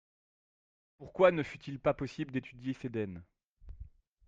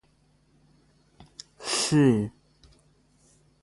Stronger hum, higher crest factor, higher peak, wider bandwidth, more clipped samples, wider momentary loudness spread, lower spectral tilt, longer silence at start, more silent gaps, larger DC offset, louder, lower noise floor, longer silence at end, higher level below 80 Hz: neither; about the same, 24 dB vs 20 dB; about the same, -12 dBFS vs -10 dBFS; second, 7.6 kHz vs 11.5 kHz; neither; about the same, 24 LU vs 26 LU; first, -7.5 dB/octave vs -5 dB/octave; second, 1 s vs 1.6 s; first, 3.44-3.57 s vs none; neither; second, -34 LUFS vs -24 LUFS; second, -53 dBFS vs -64 dBFS; second, 0.4 s vs 1.35 s; about the same, -58 dBFS vs -60 dBFS